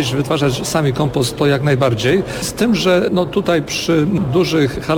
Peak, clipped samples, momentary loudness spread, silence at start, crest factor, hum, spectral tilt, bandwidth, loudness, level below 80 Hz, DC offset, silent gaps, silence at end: -4 dBFS; under 0.1%; 3 LU; 0 s; 12 dB; none; -5.5 dB/octave; 19 kHz; -16 LUFS; -40 dBFS; under 0.1%; none; 0 s